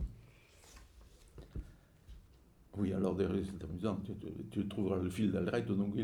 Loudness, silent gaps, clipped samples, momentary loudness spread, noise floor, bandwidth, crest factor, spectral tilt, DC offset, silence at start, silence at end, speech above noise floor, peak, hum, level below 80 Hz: -37 LUFS; none; under 0.1%; 24 LU; -63 dBFS; 13.5 kHz; 18 dB; -8 dB/octave; under 0.1%; 0 s; 0 s; 27 dB; -20 dBFS; none; -54 dBFS